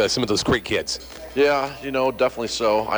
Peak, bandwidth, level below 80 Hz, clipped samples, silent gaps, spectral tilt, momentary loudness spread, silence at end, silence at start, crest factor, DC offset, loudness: -8 dBFS; over 20 kHz; -46 dBFS; under 0.1%; none; -3.5 dB/octave; 7 LU; 0 s; 0 s; 14 dB; under 0.1%; -22 LUFS